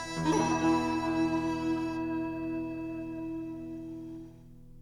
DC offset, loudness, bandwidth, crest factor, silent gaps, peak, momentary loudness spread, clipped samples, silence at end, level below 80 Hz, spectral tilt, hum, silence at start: under 0.1%; -32 LUFS; 11.5 kHz; 16 dB; none; -16 dBFS; 14 LU; under 0.1%; 0 s; -54 dBFS; -5.5 dB/octave; none; 0 s